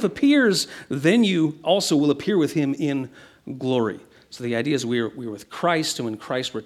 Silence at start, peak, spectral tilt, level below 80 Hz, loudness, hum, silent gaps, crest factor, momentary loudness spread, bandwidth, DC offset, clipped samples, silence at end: 0 s; -6 dBFS; -5 dB/octave; -66 dBFS; -22 LUFS; none; none; 18 dB; 12 LU; 14.5 kHz; under 0.1%; under 0.1%; 0.05 s